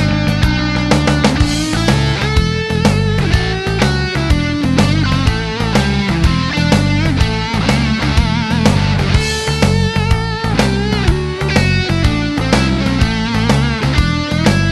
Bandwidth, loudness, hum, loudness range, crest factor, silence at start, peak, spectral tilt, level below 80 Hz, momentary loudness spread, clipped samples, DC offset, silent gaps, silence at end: 12.5 kHz; -14 LUFS; none; 1 LU; 14 dB; 0 s; 0 dBFS; -5.5 dB/octave; -22 dBFS; 3 LU; under 0.1%; under 0.1%; none; 0 s